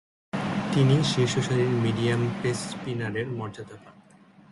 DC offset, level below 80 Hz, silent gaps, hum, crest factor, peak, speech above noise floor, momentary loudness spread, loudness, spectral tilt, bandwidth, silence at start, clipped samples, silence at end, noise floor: under 0.1%; -58 dBFS; none; none; 16 dB; -10 dBFS; 29 dB; 13 LU; -26 LUFS; -6 dB/octave; 11.5 kHz; 0.35 s; under 0.1%; 0.6 s; -54 dBFS